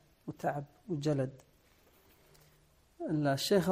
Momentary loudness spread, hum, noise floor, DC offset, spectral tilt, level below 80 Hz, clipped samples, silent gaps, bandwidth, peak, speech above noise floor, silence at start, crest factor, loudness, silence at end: 13 LU; none; -67 dBFS; under 0.1%; -5.5 dB/octave; -68 dBFS; under 0.1%; none; 15.5 kHz; -16 dBFS; 34 dB; 0.25 s; 18 dB; -35 LUFS; 0 s